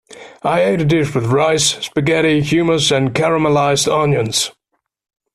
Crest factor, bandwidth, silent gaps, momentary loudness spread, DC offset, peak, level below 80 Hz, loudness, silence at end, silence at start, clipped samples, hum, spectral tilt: 14 dB; 14 kHz; none; 4 LU; under 0.1%; -2 dBFS; -46 dBFS; -15 LUFS; 0.85 s; 0.1 s; under 0.1%; none; -4.5 dB/octave